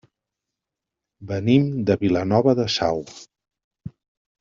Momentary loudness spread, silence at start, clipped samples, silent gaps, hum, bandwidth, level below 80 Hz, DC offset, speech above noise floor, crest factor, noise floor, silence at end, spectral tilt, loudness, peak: 22 LU; 1.2 s; under 0.1%; 3.64-3.71 s; none; 7.6 kHz; -58 dBFS; under 0.1%; 65 dB; 20 dB; -86 dBFS; 0.5 s; -6.5 dB/octave; -21 LUFS; -4 dBFS